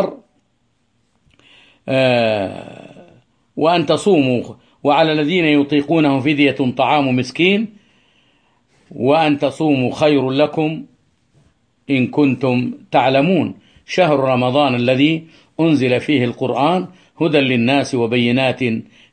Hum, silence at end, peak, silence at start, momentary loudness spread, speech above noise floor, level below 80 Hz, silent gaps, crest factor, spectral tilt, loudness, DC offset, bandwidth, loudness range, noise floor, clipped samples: none; 0.3 s; 0 dBFS; 0 s; 8 LU; 49 dB; -58 dBFS; none; 16 dB; -6.5 dB/octave; -16 LUFS; under 0.1%; 9.6 kHz; 3 LU; -64 dBFS; under 0.1%